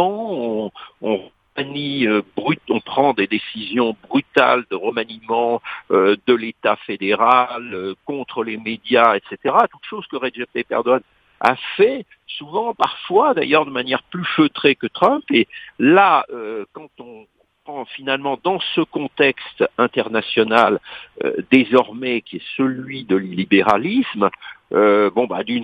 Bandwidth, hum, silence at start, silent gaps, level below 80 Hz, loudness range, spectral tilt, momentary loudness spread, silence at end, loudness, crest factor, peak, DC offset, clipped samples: 8.6 kHz; none; 0 s; none; -64 dBFS; 4 LU; -7 dB/octave; 13 LU; 0 s; -18 LUFS; 18 dB; 0 dBFS; under 0.1%; under 0.1%